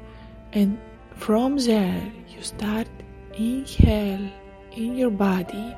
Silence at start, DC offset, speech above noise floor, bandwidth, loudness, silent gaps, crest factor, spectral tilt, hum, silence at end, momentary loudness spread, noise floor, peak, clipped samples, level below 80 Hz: 0 s; under 0.1%; 20 dB; 14.5 kHz; -24 LUFS; none; 22 dB; -6.5 dB/octave; none; 0 s; 20 LU; -42 dBFS; -2 dBFS; under 0.1%; -32 dBFS